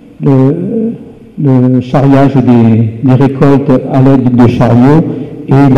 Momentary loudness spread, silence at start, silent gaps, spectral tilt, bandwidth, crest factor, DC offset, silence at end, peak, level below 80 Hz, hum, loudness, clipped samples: 8 LU; 0.2 s; none; -10 dB/octave; 6.8 kHz; 6 dB; 2%; 0 s; 0 dBFS; -36 dBFS; none; -8 LUFS; under 0.1%